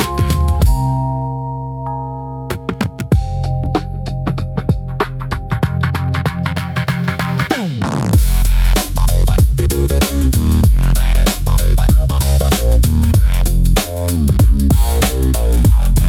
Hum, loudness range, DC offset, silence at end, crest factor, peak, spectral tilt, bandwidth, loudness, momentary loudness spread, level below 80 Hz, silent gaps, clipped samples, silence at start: none; 6 LU; under 0.1%; 0 s; 12 dB; -2 dBFS; -5.5 dB/octave; 17 kHz; -16 LUFS; 9 LU; -16 dBFS; none; under 0.1%; 0 s